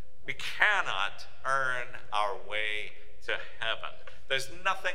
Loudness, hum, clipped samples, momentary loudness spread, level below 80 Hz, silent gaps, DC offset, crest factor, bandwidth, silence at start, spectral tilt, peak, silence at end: -31 LUFS; none; under 0.1%; 12 LU; -60 dBFS; none; 3%; 26 dB; 16 kHz; 0.05 s; -1.5 dB/octave; -6 dBFS; 0 s